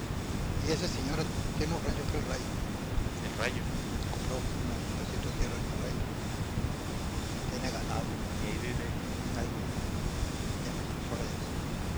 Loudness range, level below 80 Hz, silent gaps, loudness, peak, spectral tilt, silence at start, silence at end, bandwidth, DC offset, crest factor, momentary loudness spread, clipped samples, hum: 2 LU; -40 dBFS; none; -35 LUFS; -14 dBFS; -5 dB/octave; 0 s; 0 s; over 20 kHz; under 0.1%; 18 dB; 3 LU; under 0.1%; none